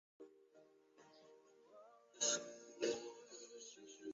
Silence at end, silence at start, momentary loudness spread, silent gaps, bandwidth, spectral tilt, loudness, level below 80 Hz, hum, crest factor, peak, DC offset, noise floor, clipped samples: 0 s; 0.2 s; 27 LU; none; 7.6 kHz; -1 dB/octave; -44 LUFS; under -90 dBFS; none; 24 dB; -26 dBFS; under 0.1%; -69 dBFS; under 0.1%